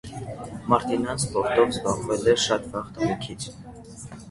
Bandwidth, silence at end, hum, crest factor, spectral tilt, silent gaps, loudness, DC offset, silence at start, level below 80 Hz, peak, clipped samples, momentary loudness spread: 11.5 kHz; 0 s; none; 22 dB; -4.5 dB/octave; none; -24 LUFS; under 0.1%; 0.05 s; -50 dBFS; -4 dBFS; under 0.1%; 19 LU